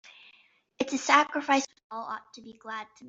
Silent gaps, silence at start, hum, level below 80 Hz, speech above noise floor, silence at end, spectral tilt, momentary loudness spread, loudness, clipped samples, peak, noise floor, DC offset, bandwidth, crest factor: 1.84-1.90 s; 0.8 s; none; -76 dBFS; 34 dB; 0 s; -1.5 dB/octave; 18 LU; -27 LUFS; under 0.1%; -4 dBFS; -63 dBFS; under 0.1%; 8 kHz; 26 dB